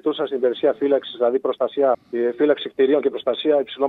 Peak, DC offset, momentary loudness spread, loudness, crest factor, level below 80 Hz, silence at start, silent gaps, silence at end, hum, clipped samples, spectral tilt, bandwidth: -4 dBFS; under 0.1%; 4 LU; -21 LUFS; 16 dB; -72 dBFS; 0.05 s; none; 0 s; none; under 0.1%; -7 dB/octave; 4.4 kHz